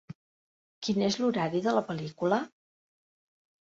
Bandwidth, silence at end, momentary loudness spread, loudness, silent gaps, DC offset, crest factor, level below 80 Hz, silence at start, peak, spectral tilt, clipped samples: 7.8 kHz; 1.15 s; 10 LU; -30 LUFS; 0.15-0.82 s; under 0.1%; 20 dB; -70 dBFS; 0.1 s; -12 dBFS; -5.5 dB/octave; under 0.1%